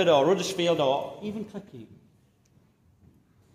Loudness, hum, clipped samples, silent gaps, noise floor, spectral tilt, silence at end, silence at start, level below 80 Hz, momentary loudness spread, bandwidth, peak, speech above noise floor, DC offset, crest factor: -26 LUFS; none; under 0.1%; none; -63 dBFS; -4.5 dB/octave; 1.7 s; 0 s; -68 dBFS; 22 LU; 15 kHz; -8 dBFS; 37 dB; under 0.1%; 20 dB